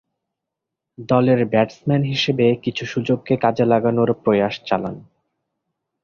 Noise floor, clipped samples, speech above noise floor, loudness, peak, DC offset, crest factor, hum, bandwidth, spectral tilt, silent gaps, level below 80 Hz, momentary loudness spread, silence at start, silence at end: -83 dBFS; under 0.1%; 64 dB; -19 LUFS; -2 dBFS; under 0.1%; 18 dB; none; 7 kHz; -7 dB/octave; none; -56 dBFS; 7 LU; 1 s; 1 s